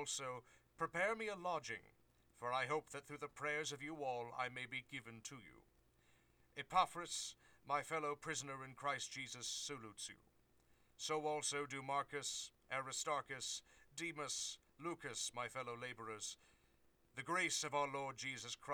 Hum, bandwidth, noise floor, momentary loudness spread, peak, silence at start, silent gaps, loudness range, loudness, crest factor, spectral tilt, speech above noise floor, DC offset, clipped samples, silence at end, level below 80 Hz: none; over 20 kHz; -75 dBFS; 12 LU; -20 dBFS; 0 s; none; 3 LU; -44 LUFS; 26 dB; -2 dB/octave; 30 dB; under 0.1%; under 0.1%; 0 s; -78 dBFS